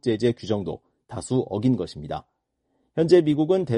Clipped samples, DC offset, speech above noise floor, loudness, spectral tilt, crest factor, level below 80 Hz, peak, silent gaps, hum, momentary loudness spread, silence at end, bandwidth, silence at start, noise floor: under 0.1%; under 0.1%; 51 dB; -23 LUFS; -7 dB/octave; 18 dB; -54 dBFS; -4 dBFS; none; none; 17 LU; 0 s; 10.5 kHz; 0.05 s; -73 dBFS